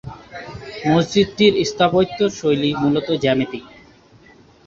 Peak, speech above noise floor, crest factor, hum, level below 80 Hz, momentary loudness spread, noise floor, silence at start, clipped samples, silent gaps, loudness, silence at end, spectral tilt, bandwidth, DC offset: -2 dBFS; 31 dB; 18 dB; none; -50 dBFS; 18 LU; -48 dBFS; 0.05 s; under 0.1%; none; -18 LUFS; 1 s; -5.5 dB/octave; 7.8 kHz; under 0.1%